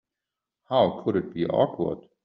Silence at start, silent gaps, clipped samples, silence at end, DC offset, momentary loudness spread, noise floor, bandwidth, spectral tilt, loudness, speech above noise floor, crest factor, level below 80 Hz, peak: 0.7 s; none; under 0.1%; 0.25 s; under 0.1%; 6 LU; -87 dBFS; 5.4 kHz; -5.5 dB/octave; -26 LUFS; 63 dB; 18 dB; -64 dBFS; -8 dBFS